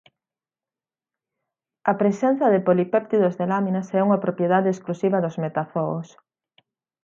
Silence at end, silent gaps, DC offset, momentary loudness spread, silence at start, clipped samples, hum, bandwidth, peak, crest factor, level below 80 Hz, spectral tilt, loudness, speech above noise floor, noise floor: 0.95 s; none; under 0.1%; 7 LU; 1.85 s; under 0.1%; none; 7.4 kHz; -4 dBFS; 20 dB; -72 dBFS; -8.5 dB/octave; -22 LUFS; over 69 dB; under -90 dBFS